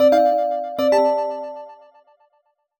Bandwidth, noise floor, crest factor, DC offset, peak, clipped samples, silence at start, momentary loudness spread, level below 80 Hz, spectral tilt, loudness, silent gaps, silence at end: 20 kHz; -67 dBFS; 14 dB; under 0.1%; -6 dBFS; under 0.1%; 0 s; 16 LU; -62 dBFS; -4.5 dB/octave; -19 LUFS; none; 1.05 s